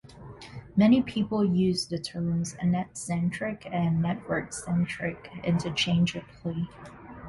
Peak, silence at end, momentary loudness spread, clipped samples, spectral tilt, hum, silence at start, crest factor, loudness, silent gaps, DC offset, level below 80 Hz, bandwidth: -10 dBFS; 0 s; 12 LU; under 0.1%; -6 dB/octave; none; 0.1 s; 18 dB; -28 LUFS; none; under 0.1%; -54 dBFS; 11.5 kHz